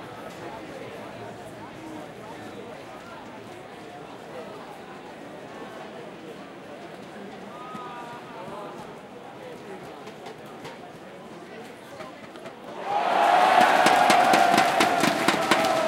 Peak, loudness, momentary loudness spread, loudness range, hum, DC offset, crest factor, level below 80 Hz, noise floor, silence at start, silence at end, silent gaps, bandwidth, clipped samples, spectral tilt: -2 dBFS; -20 LUFS; 23 LU; 20 LU; none; under 0.1%; 24 dB; -68 dBFS; -42 dBFS; 0 s; 0 s; none; 16.5 kHz; under 0.1%; -3 dB/octave